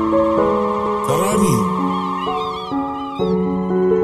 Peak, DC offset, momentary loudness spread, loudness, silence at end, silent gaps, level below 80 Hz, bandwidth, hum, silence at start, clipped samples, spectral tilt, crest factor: -2 dBFS; under 0.1%; 7 LU; -18 LUFS; 0 s; none; -44 dBFS; 14.5 kHz; none; 0 s; under 0.1%; -6 dB/octave; 14 dB